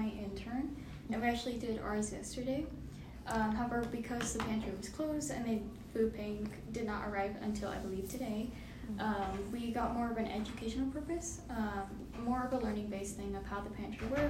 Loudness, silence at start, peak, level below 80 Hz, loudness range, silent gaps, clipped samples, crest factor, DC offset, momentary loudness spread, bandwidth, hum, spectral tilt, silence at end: -39 LUFS; 0 s; -20 dBFS; -52 dBFS; 2 LU; none; under 0.1%; 18 dB; under 0.1%; 7 LU; 16 kHz; none; -5 dB/octave; 0 s